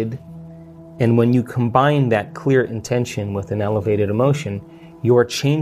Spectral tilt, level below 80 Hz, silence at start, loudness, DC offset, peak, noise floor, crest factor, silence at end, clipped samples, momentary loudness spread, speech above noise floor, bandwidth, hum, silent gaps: -7 dB/octave; -52 dBFS; 0 s; -19 LUFS; under 0.1%; -2 dBFS; -39 dBFS; 18 dB; 0 s; under 0.1%; 13 LU; 21 dB; 15 kHz; none; none